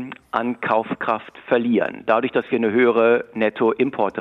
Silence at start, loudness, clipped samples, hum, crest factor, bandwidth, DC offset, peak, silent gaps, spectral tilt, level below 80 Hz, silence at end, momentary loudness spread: 0 s; -20 LUFS; under 0.1%; none; 16 dB; 5.2 kHz; under 0.1%; -4 dBFS; none; -8 dB/octave; -66 dBFS; 0 s; 8 LU